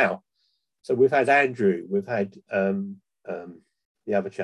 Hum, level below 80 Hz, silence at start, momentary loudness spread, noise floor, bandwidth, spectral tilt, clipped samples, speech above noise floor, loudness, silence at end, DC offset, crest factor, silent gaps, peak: none; -70 dBFS; 0 s; 20 LU; -73 dBFS; 11 kHz; -7 dB/octave; under 0.1%; 49 dB; -24 LUFS; 0 s; under 0.1%; 18 dB; 3.85-3.95 s; -8 dBFS